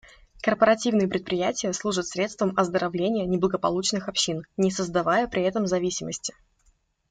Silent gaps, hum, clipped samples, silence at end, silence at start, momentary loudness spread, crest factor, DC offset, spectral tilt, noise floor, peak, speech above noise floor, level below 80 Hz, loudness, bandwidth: none; none; under 0.1%; 0.8 s; 0.35 s; 7 LU; 20 dB; under 0.1%; -4 dB/octave; -65 dBFS; -6 dBFS; 40 dB; -56 dBFS; -25 LUFS; 9.6 kHz